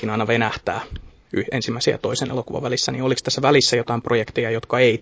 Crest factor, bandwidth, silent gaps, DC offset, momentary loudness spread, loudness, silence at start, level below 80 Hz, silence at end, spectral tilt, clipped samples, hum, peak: 18 dB; 8 kHz; none; under 0.1%; 11 LU; -21 LUFS; 0 s; -46 dBFS; 0 s; -4.5 dB/octave; under 0.1%; none; -2 dBFS